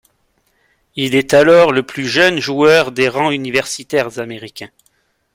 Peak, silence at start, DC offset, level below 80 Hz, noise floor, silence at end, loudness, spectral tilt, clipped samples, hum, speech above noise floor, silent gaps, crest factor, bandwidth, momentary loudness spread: 0 dBFS; 0.95 s; under 0.1%; -54 dBFS; -61 dBFS; 0.7 s; -13 LUFS; -4 dB/octave; under 0.1%; none; 48 dB; none; 14 dB; 16.5 kHz; 18 LU